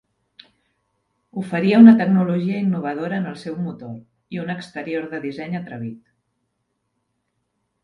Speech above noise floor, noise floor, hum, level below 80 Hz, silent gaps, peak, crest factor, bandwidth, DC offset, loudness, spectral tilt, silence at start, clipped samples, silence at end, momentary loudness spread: 55 dB; -74 dBFS; none; -66 dBFS; none; 0 dBFS; 20 dB; 5.8 kHz; under 0.1%; -19 LUFS; -8.5 dB/octave; 1.35 s; under 0.1%; 1.9 s; 23 LU